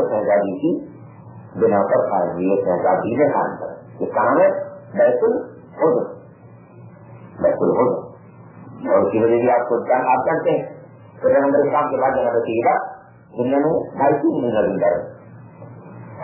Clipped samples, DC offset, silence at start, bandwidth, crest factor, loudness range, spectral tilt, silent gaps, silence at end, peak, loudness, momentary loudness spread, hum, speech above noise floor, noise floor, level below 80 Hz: under 0.1%; under 0.1%; 0 s; 3.1 kHz; 16 dB; 3 LU; -11.5 dB/octave; none; 0 s; -4 dBFS; -19 LUFS; 16 LU; none; 26 dB; -43 dBFS; -58 dBFS